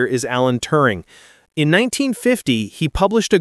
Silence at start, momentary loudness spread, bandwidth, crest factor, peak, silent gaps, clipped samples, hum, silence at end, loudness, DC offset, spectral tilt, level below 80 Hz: 0 s; 6 LU; 13.5 kHz; 16 dB; 0 dBFS; none; under 0.1%; none; 0 s; -17 LUFS; under 0.1%; -5 dB/octave; -38 dBFS